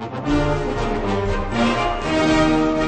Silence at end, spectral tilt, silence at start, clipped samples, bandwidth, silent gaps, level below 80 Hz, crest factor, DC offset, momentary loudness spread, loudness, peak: 0 s; -6 dB/octave; 0 s; under 0.1%; 9 kHz; none; -30 dBFS; 14 dB; under 0.1%; 6 LU; -20 LUFS; -6 dBFS